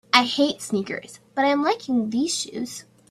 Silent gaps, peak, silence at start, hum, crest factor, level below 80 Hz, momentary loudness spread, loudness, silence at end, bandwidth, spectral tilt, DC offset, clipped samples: none; 0 dBFS; 0.15 s; none; 24 dB; -68 dBFS; 13 LU; -23 LUFS; 0.3 s; 14.5 kHz; -3 dB/octave; under 0.1%; under 0.1%